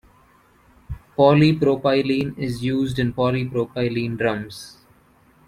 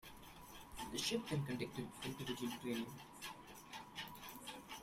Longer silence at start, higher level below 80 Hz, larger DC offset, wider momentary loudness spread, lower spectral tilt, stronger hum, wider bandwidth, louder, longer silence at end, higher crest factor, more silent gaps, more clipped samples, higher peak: first, 0.9 s vs 0 s; first, -48 dBFS vs -68 dBFS; neither; first, 19 LU vs 15 LU; first, -7.5 dB/octave vs -4 dB/octave; neither; second, 13.5 kHz vs 16 kHz; first, -20 LUFS vs -46 LUFS; first, 0.75 s vs 0 s; about the same, 20 dB vs 20 dB; neither; neither; first, -2 dBFS vs -26 dBFS